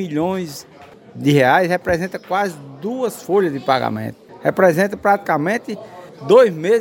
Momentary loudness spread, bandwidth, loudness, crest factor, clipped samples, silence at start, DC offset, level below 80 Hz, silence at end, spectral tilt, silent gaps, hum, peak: 17 LU; 17 kHz; -17 LUFS; 18 dB; under 0.1%; 0 s; under 0.1%; -52 dBFS; 0 s; -6 dB/octave; none; none; 0 dBFS